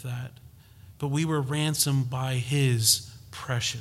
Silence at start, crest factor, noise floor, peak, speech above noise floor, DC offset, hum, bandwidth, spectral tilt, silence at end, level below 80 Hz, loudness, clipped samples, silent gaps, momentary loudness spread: 0 s; 20 dB; -51 dBFS; -8 dBFS; 24 dB; under 0.1%; none; 16 kHz; -4 dB/octave; 0 s; -58 dBFS; -26 LUFS; under 0.1%; none; 15 LU